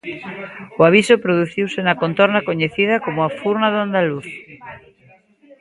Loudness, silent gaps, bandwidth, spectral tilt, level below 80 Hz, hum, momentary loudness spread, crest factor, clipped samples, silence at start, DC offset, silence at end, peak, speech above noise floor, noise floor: -17 LUFS; none; 11.5 kHz; -6 dB/octave; -58 dBFS; none; 19 LU; 18 dB; under 0.1%; 0.05 s; under 0.1%; 0.05 s; 0 dBFS; 34 dB; -52 dBFS